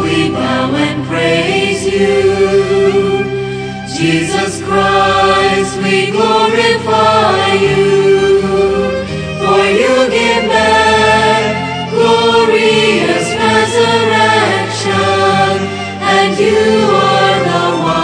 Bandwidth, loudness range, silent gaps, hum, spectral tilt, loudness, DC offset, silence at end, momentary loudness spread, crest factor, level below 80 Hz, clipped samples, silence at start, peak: 10 kHz; 2 LU; none; none; -4.5 dB/octave; -11 LUFS; under 0.1%; 0 s; 6 LU; 10 dB; -40 dBFS; under 0.1%; 0 s; 0 dBFS